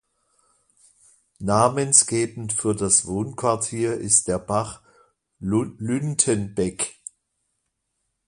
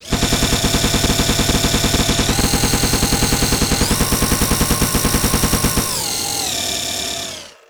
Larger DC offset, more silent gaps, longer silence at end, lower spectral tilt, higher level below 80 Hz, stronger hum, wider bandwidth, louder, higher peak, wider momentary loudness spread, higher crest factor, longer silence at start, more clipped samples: second, under 0.1% vs 0.6%; neither; first, 1.35 s vs 0.15 s; about the same, -4 dB/octave vs -3 dB/octave; second, -52 dBFS vs -24 dBFS; neither; second, 11.5 kHz vs over 20 kHz; second, -21 LUFS vs -16 LUFS; about the same, 0 dBFS vs -2 dBFS; first, 13 LU vs 3 LU; first, 24 dB vs 14 dB; first, 1.4 s vs 0 s; neither